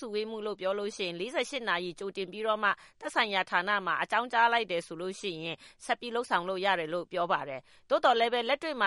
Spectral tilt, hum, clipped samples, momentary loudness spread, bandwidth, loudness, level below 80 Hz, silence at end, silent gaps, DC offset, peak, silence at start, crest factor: -3.5 dB/octave; none; under 0.1%; 11 LU; 11.5 kHz; -30 LUFS; -72 dBFS; 0 s; none; under 0.1%; -10 dBFS; 0 s; 20 dB